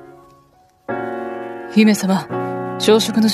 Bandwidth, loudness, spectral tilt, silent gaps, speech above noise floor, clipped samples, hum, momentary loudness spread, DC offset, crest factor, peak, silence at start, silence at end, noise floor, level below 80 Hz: 14 kHz; -18 LUFS; -5 dB/octave; none; 39 dB; under 0.1%; none; 14 LU; under 0.1%; 18 dB; 0 dBFS; 0 s; 0 s; -53 dBFS; -62 dBFS